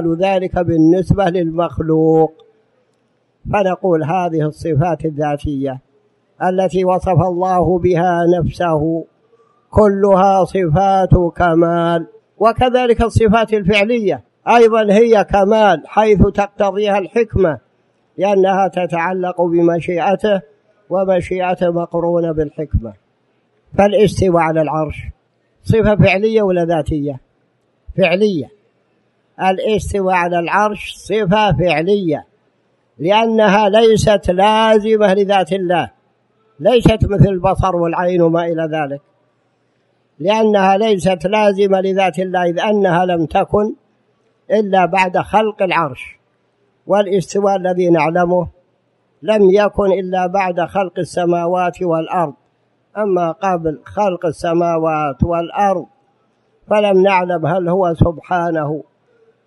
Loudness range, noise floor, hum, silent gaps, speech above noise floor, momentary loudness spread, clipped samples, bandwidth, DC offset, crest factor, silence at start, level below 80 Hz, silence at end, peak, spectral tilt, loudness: 5 LU; -61 dBFS; none; none; 47 dB; 9 LU; under 0.1%; 11.5 kHz; under 0.1%; 14 dB; 0 s; -34 dBFS; 0.65 s; 0 dBFS; -7 dB/octave; -15 LUFS